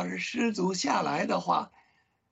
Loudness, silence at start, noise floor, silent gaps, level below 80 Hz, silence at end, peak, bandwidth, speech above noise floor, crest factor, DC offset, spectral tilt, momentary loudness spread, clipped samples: -29 LUFS; 0 s; -69 dBFS; none; -74 dBFS; 0.65 s; -12 dBFS; 8.4 kHz; 40 dB; 18 dB; under 0.1%; -4.5 dB/octave; 4 LU; under 0.1%